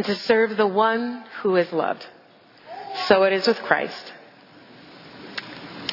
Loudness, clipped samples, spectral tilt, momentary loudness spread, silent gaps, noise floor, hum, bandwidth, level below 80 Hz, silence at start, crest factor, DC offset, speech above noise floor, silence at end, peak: -22 LUFS; under 0.1%; -5.5 dB/octave; 21 LU; none; -52 dBFS; none; 5.8 kHz; -70 dBFS; 0 s; 22 dB; under 0.1%; 30 dB; 0 s; -2 dBFS